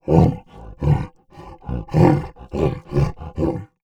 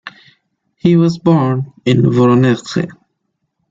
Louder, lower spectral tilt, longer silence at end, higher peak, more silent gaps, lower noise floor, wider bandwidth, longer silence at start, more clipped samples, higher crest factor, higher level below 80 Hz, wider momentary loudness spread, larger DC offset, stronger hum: second, -21 LUFS vs -13 LUFS; first, -9.5 dB/octave vs -8 dB/octave; second, 0.2 s vs 0.8 s; about the same, -2 dBFS vs -2 dBFS; neither; second, -42 dBFS vs -70 dBFS; about the same, 8.4 kHz vs 7.8 kHz; about the same, 0.05 s vs 0.05 s; neither; first, 18 dB vs 12 dB; first, -32 dBFS vs -52 dBFS; first, 14 LU vs 10 LU; neither; neither